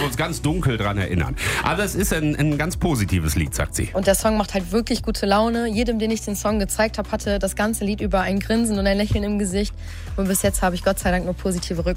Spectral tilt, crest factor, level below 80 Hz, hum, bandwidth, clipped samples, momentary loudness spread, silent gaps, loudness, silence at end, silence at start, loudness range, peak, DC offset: -5 dB/octave; 16 dB; -32 dBFS; none; 16 kHz; under 0.1%; 5 LU; none; -22 LUFS; 0 s; 0 s; 1 LU; -6 dBFS; under 0.1%